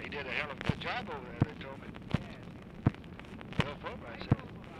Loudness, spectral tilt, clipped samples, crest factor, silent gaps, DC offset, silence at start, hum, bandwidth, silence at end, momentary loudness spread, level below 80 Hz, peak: -37 LUFS; -7 dB/octave; under 0.1%; 26 dB; none; under 0.1%; 0 s; none; 11 kHz; 0 s; 13 LU; -52 dBFS; -12 dBFS